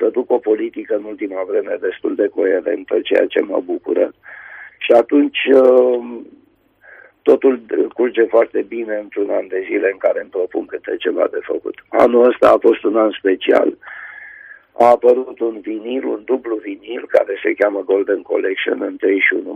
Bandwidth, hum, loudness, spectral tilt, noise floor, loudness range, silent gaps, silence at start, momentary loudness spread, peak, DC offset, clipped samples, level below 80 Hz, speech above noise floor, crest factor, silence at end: 6.2 kHz; none; -16 LUFS; -5.5 dB/octave; -52 dBFS; 4 LU; none; 0 s; 14 LU; 0 dBFS; under 0.1%; under 0.1%; -60 dBFS; 36 dB; 16 dB; 0 s